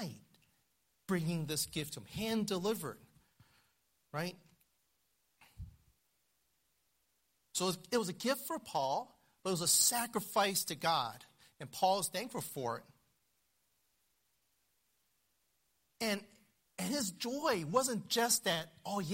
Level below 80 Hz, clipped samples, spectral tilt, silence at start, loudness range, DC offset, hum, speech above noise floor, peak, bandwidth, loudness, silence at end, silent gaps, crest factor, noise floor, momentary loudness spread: -70 dBFS; under 0.1%; -3 dB/octave; 0 s; 17 LU; under 0.1%; none; 43 dB; -16 dBFS; 16 kHz; -35 LUFS; 0 s; none; 24 dB; -79 dBFS; 15 LU